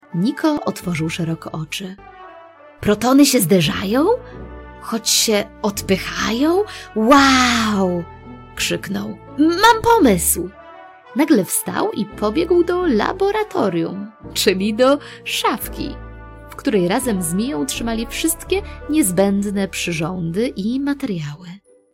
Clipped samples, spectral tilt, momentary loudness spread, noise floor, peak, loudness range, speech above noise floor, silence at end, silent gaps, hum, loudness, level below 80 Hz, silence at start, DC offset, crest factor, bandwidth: under 0.1%; -4 dB/octave; 15 LU; -42 dBFS; -2 dBFS; 4 LU; 24 dB; 0.35 s; none; none; -18 LUFS; -40 dBFS; 0.1 s; under 0.1%; 18 dB; 16 kHz